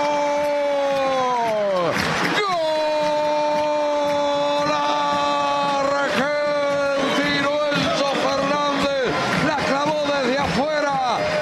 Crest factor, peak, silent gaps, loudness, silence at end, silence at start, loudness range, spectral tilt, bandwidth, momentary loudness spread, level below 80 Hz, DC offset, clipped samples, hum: 14 dB; -6 dBFS; none; -20 LUFS; 0 s; 0 s; 0 LU; -4 dB/octave; 13.5 kHz; 1 LU; -52 dBFS; under 0.1%; under 0.1%; none